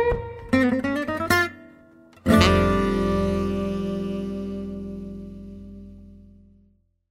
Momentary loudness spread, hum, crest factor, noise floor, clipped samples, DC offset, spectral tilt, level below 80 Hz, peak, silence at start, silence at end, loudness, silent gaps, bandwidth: 21 LU; none; 24 dB; -62 dBFS; under 0.1%; under 0.1%; -6 dB/octave; -38 dBFS; -2 dBFS; 0 s; 0.9 s; -23 LUFS; none; 16 kHz